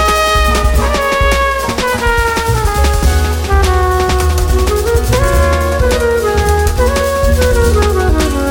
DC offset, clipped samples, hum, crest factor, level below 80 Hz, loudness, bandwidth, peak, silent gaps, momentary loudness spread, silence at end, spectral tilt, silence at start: under 0.1%; under 0.1%; none; 10 dB; -14 dBFS; -12 LUFS; 17 kHz; 0 dBFS; none; 2 LU; 0 s; -5 dB/octave; 0 s